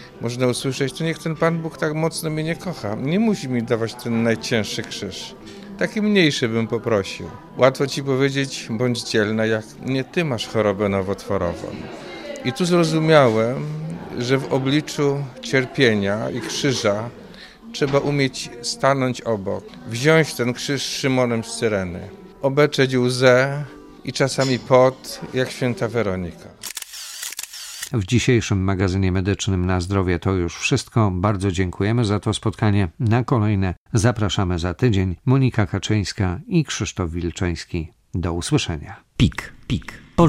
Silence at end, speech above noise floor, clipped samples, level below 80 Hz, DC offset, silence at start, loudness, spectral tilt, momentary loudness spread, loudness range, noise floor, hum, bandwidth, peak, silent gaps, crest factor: 0 s; 20 dB; under 0.1%; -44 dBFS; under 0.1%; 0 s; -21 LUFS; -5.5 dB/octave; 13 LU; 4 LU; -41 dBFS; none; 16 kHz; 0 dBFS; 33.77-33.86 s; 20 dB